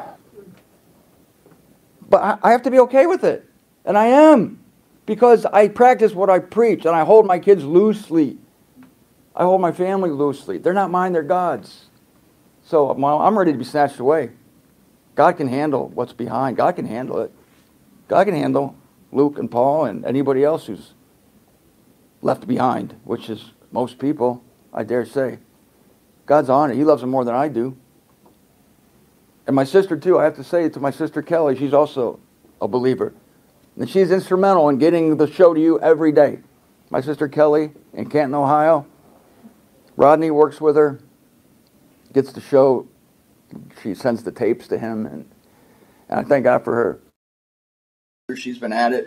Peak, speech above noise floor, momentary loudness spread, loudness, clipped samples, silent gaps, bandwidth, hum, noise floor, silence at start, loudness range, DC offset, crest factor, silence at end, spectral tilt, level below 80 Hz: 0 dBFS; 39 dB; 15 LU; -17 LUFS; under 0.1%; 47.16-48.28 s; 15 kHz; none; -56 dBFS; 0 s; 8 LU; under 0.1%; 18 dB; 0 s; -7.5 dB/octave; -64 dBFS